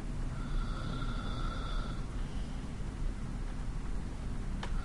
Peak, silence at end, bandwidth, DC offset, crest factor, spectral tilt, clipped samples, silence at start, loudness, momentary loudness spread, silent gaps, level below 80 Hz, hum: -24 dBFS; 0 s; 11 kHz; under 0.1%; 12 dB; -6 dB/octave; under 0.1%; 0 s; -41 LUFS; 3 LU; none; -38 dBFS; none